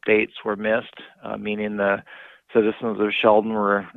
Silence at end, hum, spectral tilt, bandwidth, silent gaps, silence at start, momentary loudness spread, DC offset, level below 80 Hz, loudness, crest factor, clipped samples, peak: 0.05 s; none; -8 dB/octave; 4.1 kHz; none; 0.05 s; 12 LU; under 0.1%; -62 dBFS; -22 LUFS; 20 dB; under 0.1%; -4 dBFS